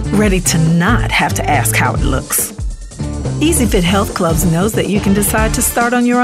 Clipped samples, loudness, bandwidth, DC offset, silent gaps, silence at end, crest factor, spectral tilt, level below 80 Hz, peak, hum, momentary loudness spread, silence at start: under 0.1%; -13 LUFS; 16 kHz; under 0.1%; none; 0 s; 12 dB; -4.5 dB/octave; -24 dBFS; 0 dBFS; none; 8 LU; 0 s